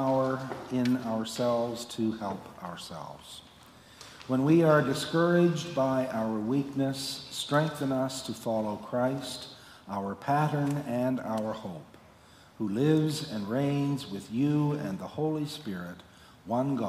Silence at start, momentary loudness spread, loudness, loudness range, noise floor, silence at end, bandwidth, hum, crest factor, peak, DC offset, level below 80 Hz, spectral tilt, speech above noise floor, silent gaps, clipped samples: 0 s; 16 LU; -30 LUFS; 6 LU; -56 dBFS; 0 s; 15.5 kHz; none; 18 dB; -12 dBFS; under 0.1%; -66 dBFS; -6 dB/octave; 27 dB; none; under 0.1%